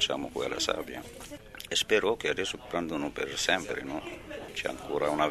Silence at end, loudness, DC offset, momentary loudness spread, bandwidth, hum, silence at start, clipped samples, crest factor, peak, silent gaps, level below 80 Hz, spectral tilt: 0 s; -31 LUFS; under 0.1%; 15 LU; 13.5 kHz; none; 0 s; under 0.1%; 24 dB; -8 dBFS; none; -56 dBFS; -2.5 dB/octave